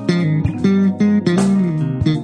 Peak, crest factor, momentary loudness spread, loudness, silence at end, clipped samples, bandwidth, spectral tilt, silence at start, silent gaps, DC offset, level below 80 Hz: -2 dBFS; 12 dB; 3 LU; -16 LUFS; 0 s; under 0.1%; 10 kHz; -7.5 dB/octave; 0 s; none; under 0.1%; -40 dBFS